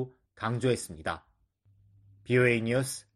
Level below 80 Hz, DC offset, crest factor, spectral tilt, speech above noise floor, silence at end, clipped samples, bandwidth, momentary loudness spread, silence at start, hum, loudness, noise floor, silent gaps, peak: -60 dBFS; under 0.1%; 20 dB; -5.5 dB/octave; 38 dB; 0.15 s; under 0.1%; 13.5 kHz; 13 LU; 0 s; none; -29 LUFS; -67 dBFS; none; -10 dBFS